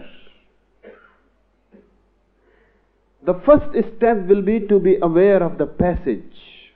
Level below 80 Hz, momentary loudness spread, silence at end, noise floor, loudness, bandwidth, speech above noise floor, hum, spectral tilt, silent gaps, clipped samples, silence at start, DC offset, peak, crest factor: -40 dBFS; 10 LU; 0.35 s; -61 dBFS; -17 LUFS; 4.3 kHz; 45 dB; none; -12 dB/octave; none; under 0.1%; 0 s; under 0.1%; 0 dBFS; 20 dB